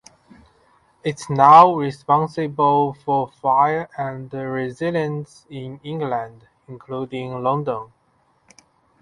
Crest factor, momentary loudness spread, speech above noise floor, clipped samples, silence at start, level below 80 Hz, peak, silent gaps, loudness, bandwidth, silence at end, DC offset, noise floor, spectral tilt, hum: 20 dB; 18 LU; 43 dB; under 0.1%; 1.05 s; -62 dBFS; 0 dBFS; none; -19 LUFS; 11.5 kHz; 1.15 s; under 0.1%; -62 dBFS; -7 dB/octave; none